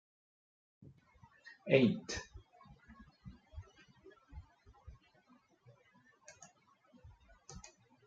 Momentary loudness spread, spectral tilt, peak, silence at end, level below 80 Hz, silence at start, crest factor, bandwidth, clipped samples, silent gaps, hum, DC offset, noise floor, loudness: 30 LU; -5.5 dB/octave; -14 dBFS; 0.45 s; -64 dBFS; 1.45 s; 28 dB; 8.8 kHz; under 0.1%; none; none; under 0.1%; -69 dBFS; -34 LUFS